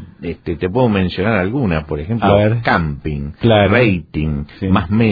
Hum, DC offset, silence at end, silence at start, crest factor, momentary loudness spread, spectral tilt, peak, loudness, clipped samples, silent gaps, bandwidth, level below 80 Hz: none; under 0.1%; 0 s; 0 s; 16 dB; 10 LU; -10 dB/octave; 0 dBFS; -16 LUFS; under 0.1%; none; 5 kHz; -34 dBFS